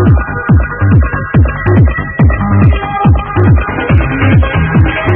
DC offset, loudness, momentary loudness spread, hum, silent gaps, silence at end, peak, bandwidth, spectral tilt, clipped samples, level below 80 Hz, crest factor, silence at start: under 0.1%; -10 LUFS; 2 LU; none; none; 0 s; 0 dBFS; 3.5 kHz; -11 dB/octave; 0.6%; -16 dBFS; 8 dB; 0 s